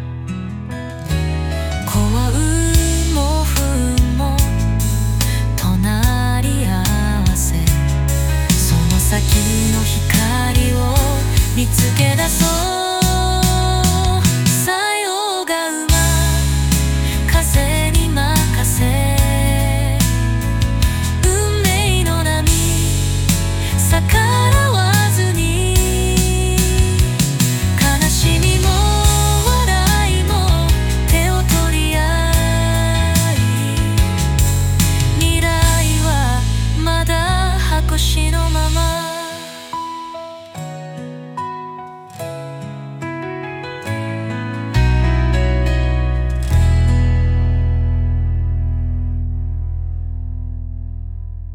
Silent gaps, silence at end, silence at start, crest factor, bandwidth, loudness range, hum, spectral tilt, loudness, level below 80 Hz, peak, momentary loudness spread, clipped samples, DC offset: none; 0 s; 0 s; 14 dB; 19 kHz; 7 LU; none; -4.5 dB/octave; -16 LUFS; -20 dBFS; 0 dBFS; 12 LU; under 0.1%; under 0.1%